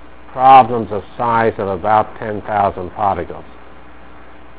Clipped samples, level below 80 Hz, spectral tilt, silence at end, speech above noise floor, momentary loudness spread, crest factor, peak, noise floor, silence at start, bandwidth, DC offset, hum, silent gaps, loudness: 0.4%; -42 dBFS; -9.5 dB/octave; 1.15 s; 26 dB; 17 LU; 16 dB; 0 dBFS; -40 dBFS; 0.35 s; 4 kHz; 2%; none; none; -15 LUFS